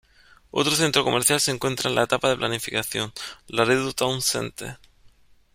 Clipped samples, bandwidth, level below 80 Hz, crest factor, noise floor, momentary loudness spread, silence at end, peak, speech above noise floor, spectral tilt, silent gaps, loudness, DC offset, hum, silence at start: under 0.1%; 16.5 kHz; -56 dBFS; 22 dB; -54 dBFS; 11 LU; 0.8 s; -4 dBFS; 30 dB; -3 dB/octave; none; -23 LUFS; under 0.1%; none; 0.55 s